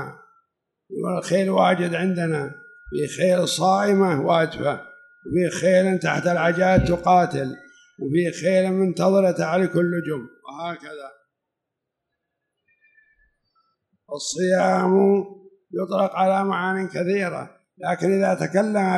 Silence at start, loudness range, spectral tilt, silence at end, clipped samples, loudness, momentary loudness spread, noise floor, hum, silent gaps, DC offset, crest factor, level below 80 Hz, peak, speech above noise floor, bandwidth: 0 s; 8 LU; -6 dB/octave; 0 s; under 0.1%; -21 LUFS; 15 LU; -82 dBFS; none; none; under 0.1%; 18 dB; -48 dBFS; -4 dBFS; 62 dB; 12 kHz